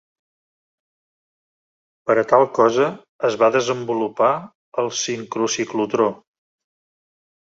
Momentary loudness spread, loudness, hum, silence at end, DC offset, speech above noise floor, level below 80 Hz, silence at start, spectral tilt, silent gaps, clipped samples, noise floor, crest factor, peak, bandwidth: 8 LU; -20 LUFS; none; 1.25 s; under 0.1%; over 71 dB; -66 dBFS; 2.05 s; -4 dB/octave; 3.09-3.19 s, 4.55-4.72 s; under 0.1%; under -90 dBFS; 20 dB; -2 dBFS; 8 kHz